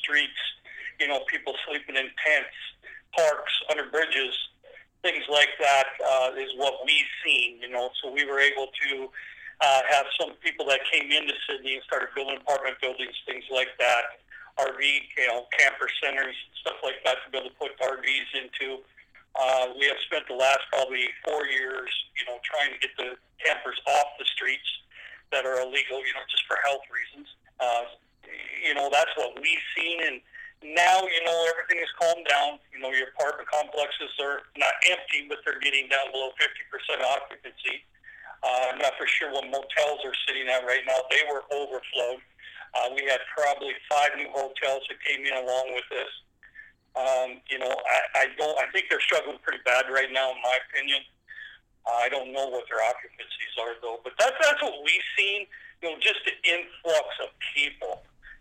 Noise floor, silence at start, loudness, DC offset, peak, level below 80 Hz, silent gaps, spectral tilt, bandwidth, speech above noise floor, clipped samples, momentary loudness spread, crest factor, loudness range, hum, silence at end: -53 dBFS; 0 s; -26 LUFS; under 0.1%; -4 dBFS; -68 dBFS; none; 0 dB/octave; 16 kHz; 26 dB; under 0.1%; 13 LU; 24 dB; 4 LU; none; 0.05 s